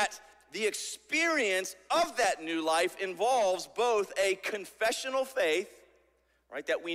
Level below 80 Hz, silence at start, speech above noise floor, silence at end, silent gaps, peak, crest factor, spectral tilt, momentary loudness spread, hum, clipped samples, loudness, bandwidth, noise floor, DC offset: -72 dBFS; 0 s; 40 dB; 0 s; none; -14 dBFS; 16 dB; -1.5 dB/octave; 9 LU; none; under 0.1%; -30 LUFS; 16 kHz; -70 dBFS; under 0.1%